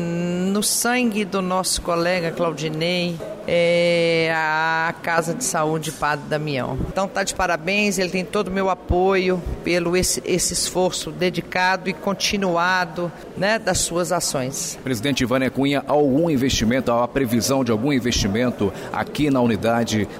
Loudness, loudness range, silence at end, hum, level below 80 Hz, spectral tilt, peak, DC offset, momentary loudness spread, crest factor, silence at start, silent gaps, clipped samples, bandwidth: -21 LUFS; 2 LU; 0 s; none; -40 dBFS; -4 dB/octave; -4 dBFS; under 0.1%; 6 LU; 16 dB; 0 s; none; under 0.1%; 16 kHz